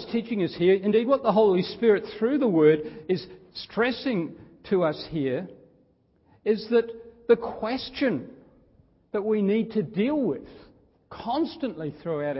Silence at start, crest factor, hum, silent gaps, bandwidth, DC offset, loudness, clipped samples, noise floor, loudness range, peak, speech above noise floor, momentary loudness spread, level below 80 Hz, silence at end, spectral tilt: 0 s; 18 dB; none; none; 5.8 kHz; under 0.1%; -25 LUFS; under 0.1%; -63 dBFS; 6 LU; -6 dBFS; 39 dB; 13 LU; -62 dBFS; 0 s; -10.5 dB/octave